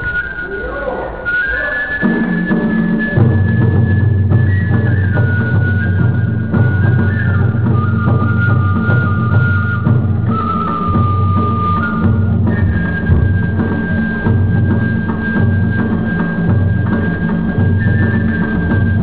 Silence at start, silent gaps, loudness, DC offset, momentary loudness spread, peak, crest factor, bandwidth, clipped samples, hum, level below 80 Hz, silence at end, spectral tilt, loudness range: 0 s; none; -14 LUFS; 3%; 4 LU; 0 dBFS; 12 dB; 4 kHz; under 0.1%; none; -24 dBFS; 0 s; -12 dB/octave; 2 LU